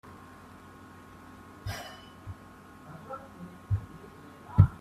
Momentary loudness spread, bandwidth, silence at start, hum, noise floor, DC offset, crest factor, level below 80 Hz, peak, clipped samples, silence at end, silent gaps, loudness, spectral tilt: 17 LU; 13.5 kHz; 0.05 s; none; -51 dBFS; under 0.1%; 28 dB; -48 dBFS; -6 dBFS; under 0.1%; 0 s; none; -33 LUFS; -7.5 dB/octave